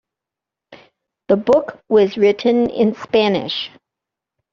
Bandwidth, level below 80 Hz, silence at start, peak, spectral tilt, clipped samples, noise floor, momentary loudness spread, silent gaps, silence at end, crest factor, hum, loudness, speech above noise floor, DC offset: 7.2 kHz; -58 dBFS; 0.7 s; -2 dBFS; -4 dB/octave; under 0.1%; -86 dBFS; 7 LU; none; 0.85 s; 16 dB; none; -17 LUFS; 70 dB; under 0.1%